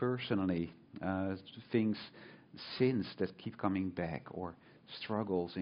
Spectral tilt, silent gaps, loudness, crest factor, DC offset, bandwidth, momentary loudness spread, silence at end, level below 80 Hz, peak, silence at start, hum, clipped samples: -5.5 dB/octave; none; -38 LUFS; 20 dB; under 0.1%; 5.4 kHz; 15 LU; 0 s; -68 dBFS; -18 dBFS; 0 s; none; under 0.1%